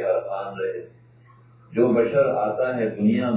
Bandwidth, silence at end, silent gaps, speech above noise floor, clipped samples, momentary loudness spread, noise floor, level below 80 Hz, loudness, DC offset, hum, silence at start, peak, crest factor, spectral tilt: 4 kHz; 0 s; none; 30 dB; under 0.1%; 11 LU; -52 dBFS; -62 dBFS; -23 LUFS; under 0.1%; none; 0 s; -6 dBFS; 16 dB; -11.5 dB/octave